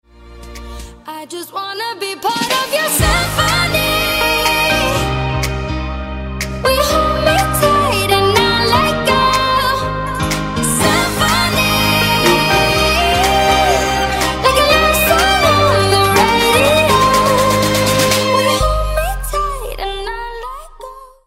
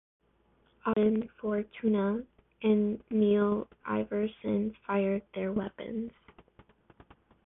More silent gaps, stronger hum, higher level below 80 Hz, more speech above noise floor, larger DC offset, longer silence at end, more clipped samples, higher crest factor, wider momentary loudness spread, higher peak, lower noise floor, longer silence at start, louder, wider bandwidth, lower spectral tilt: neither; neither; first, -26 dBFS vs -62 dBFS; second, 17 dB vs 39 dB; neither; second, 0.2 s vs 1.4 s; neither; about the same, 14 dB vs 16 dB; first, 13 LU vs 10 LU; first, 0 dBFS vs -14 dBFS; second, -35 dBFS vs -68 dBFS; second, 0.2 s vs 0.85 s; first, -13 LUFS vs -31 LUFS; first, 16 kHz vs 3.8 kHz; second, -3.5 dB/octave vs -11 dB/octave